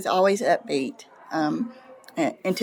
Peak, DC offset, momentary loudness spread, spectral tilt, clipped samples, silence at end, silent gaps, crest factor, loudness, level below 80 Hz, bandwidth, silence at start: -8 dBFS; under 0.1%; 13 LU; -5 dB/octave; under 0.1%; 0 s; none; 16 dB; -25 LUFS; -80 dBFS; 19.5 kHz; 0 s